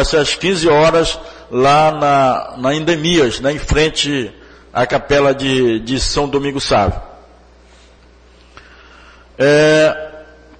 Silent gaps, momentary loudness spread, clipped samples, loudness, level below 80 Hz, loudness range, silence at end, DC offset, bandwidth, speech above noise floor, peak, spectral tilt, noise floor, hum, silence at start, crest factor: none; 9 LU; under 0.1%; -14 LUFS; -32 dBFS; 6 LU; 0.35 s; under 0.1%; 9.4 kHz; 31 dB; -2 dBFS; -4.5 dB/octave; -45 dBFS; none; 0 s; 12 dB